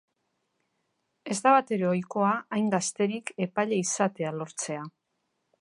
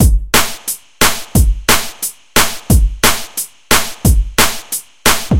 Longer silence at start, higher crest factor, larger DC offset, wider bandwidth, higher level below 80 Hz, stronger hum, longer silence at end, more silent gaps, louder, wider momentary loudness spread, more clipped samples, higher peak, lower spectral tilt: first, 1.25 s vs 0 s; first, 22 dB vs 12 dB; neither; second, 11.5 kHz vs over 20 kHz; second, -78 dBFS vs -18 dBFS; neither; first, 0.7 s vs 0 s; neither; second, -27 LUFS vs -14 LUFS; about the same, 12 LU vs 10 LU; second, under 0.1% vs 0.3%; second, -8 dBFS vs 0 dBFS; first, -4.5 dB/octave vs -3 dB/octave